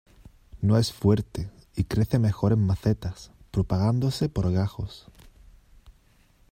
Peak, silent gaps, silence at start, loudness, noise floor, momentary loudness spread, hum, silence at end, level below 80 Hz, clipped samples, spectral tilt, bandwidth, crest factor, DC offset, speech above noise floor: -8 dBFS; none; 0.55 s; -26 LUFS; -60 dBFS; 14 LU; none; 1.5 s; -44 dBFS; under 0.1%; -7.5 dB/octave; 16 kHz; 18 dB; under 0.1%; 36 dB